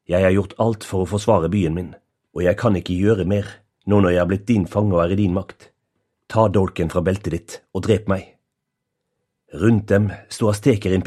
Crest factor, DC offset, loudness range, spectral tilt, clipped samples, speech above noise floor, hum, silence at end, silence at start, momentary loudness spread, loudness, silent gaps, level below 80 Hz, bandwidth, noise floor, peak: 20 dB; under 0.1%; 3 LU; -7.5 dB/octave; under 0.1%; 60 dB; none; 0 s; 0.1 s; 10 LU; -20 LUFS; none; -44 dBFS; 13 kHz; -78 dBFS; 0 dBFS